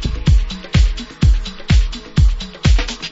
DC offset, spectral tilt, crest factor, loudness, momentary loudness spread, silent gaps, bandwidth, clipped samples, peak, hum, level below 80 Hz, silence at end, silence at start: under 0.1%; -5.5 dB/octave; 12 dB; -17 LUFS; 3 LU; none; 8 kHz; under 0.1%; -2 dBFS; none; -16 dBFS; 0 s; 0 s